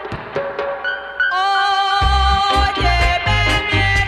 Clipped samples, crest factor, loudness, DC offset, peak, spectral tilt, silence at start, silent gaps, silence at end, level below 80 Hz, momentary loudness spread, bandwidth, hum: under 0.1%; 14 dB; -16 LUFS; under 0.1%; -4 dBFS; -4 dB/octave; 0 s; none; 0 s; -24 dBFS; 8 LU; 13 kHz; none